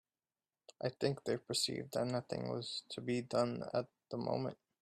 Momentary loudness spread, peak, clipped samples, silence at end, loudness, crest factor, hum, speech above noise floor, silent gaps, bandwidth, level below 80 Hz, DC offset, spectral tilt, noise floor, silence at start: 7 LU; -20 dBFS; under 0.1%; 0.25 s; -39 LUFS; 20 dB; none; over 51 dB; none; 13 kHz; -76 dBFS; under 0.1%; -4.5 dB/octave; under -90 dBFS; 0.8 s